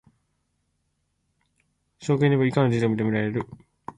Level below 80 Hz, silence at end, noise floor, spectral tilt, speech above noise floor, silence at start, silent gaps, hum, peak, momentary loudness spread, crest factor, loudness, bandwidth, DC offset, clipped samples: -60 dBFS; 0.05 s; -74 dBFS; -8 dB/octave; 51 dB; 2 s; none; none; -8 dBFS; 16 LU; 18 dB; -23 LUFS; 10.5 kHz; under 0.1%; under 0.1%